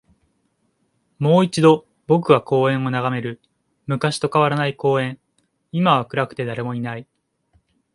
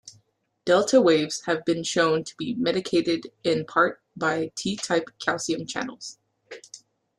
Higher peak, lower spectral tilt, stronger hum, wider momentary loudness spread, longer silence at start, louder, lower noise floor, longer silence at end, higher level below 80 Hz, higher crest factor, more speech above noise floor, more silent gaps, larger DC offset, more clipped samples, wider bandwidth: first, 0 dBFS vs -6 dBFS; first, -6.5 dB/octave vs -4 dB/octave; neither; about the same, 13 LU vs 15 LU; first, 1.2 s vs 0.05 s; first, -19 LUFS vs -24 LUFS; about the same, -68 dBFS vs -65 dBFS; first, 0.9 s vs 0.4 s; about the same, -62 dBFS vs -66 dBFS; about the same, 20 dB vs 18 dB; first, 49 dB vs 41 dB; neither; neither; neither; about the same, 11.5 kHz vs 12 kHz